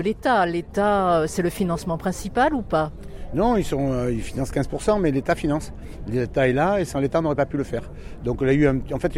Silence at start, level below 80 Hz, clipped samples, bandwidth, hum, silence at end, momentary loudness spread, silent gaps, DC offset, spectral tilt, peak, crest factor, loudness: 0 s; -36 dBFS; under 0.1%; 16 kHz; none; 0 s; 10 LU; none; under 0.1%; -6.5 dB/octave; -8 dBFS; 14 dB; -23 LUFS